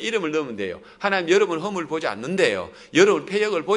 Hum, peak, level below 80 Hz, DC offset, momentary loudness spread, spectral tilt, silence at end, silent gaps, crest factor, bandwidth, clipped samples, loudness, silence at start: none; -2 dBFS; -66 dBFS; under 0.1%; 11 LU; -4 dB/octave; 0 s; none; 20 dB; 11 kHz; under 0.1%; -22 LUFS; 0 s